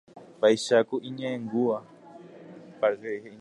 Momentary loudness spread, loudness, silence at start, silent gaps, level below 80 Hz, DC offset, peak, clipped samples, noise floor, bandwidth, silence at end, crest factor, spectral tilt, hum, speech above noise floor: 24 LU; -27 LUFS; 0.15 s; none; -78 dBFS; under 0.1%; -10 dBFS; under 0.1%; -48 dBFS; 11.5 kHz; 0 s; 18 dB; -4.5 dB/octave; none; 22 dB